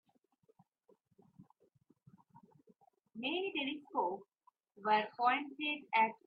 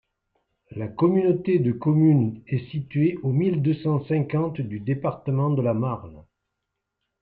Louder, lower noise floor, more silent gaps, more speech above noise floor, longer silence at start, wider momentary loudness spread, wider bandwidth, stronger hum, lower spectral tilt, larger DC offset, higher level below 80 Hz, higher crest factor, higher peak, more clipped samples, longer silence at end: second, -36 LUFS vs -23 LUFS; second, -75 dBFS vs -81 dBFS; neither; second, 39 dB vs 59 dB; first, 1.4 s vs 0.7 s; about the same, 10 LU vs 10 LU; first, 5 kHz vs 4.5 kHz; neither; second, -0.5 dB/octave vs -12 dB/octave; neither; second, under -90 dBFS vs -60 dBFS; first, 22 dB vs 16 dB; second, -18 dBFS vs -8 dBFS; neither; second, 0.1 s vs 1 s